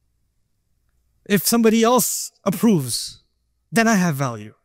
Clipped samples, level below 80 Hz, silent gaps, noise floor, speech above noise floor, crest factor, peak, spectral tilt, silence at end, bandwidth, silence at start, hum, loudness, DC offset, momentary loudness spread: under 0.1%; -60 dBFS; none; -68 dBFS; 50 dB; 18 dB; -4 dBFS; -4.5 dB/octave; 0.15 s; 16.5 kHz; 1.3 s; none; -19 LUFS; under 0.1%; 10 LU